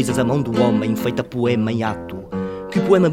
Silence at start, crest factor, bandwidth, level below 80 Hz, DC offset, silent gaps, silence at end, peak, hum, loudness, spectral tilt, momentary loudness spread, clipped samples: 0 s; 16 dB; 17 kHz; -48 dBFS; under 0.1%; none; 0 s; -2 dBFS; none; -20 LUFS; -7 dB/octave; 10 LU; under 0.1%